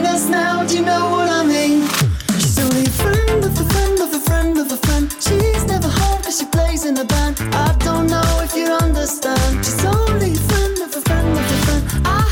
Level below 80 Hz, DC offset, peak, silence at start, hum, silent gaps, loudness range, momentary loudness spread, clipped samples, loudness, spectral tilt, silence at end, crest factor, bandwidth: -22 dBFS; under 0.1%; -6 dBFS; 0 s; none; none; 1 LU; 3 LU; under 0.1%; -16 LUFS; -4.5 dB/octave; 0 s; 10 dB; 18 kHz